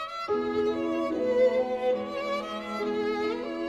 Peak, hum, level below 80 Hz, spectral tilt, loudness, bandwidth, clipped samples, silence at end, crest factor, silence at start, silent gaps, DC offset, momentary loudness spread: -14 dBFS; none; -62 dBFS; -5.5 dB/octave; -28 LUFS; 9.8 kHz; under 0.1%; 0 s; 14 dB; 0 s; none; under 0.1%; 7 LU